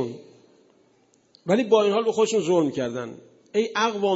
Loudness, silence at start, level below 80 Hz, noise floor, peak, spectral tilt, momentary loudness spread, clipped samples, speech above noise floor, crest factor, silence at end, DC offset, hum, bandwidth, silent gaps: -23 LUFS; 0 s; -72 dBFS; -62 dBFS; -6 dBFS; -5 dB/octave; 16 LU; under 0.1%; 40 dB; 18 dB; 0 s; under 0.1%; none; 8 kHz; none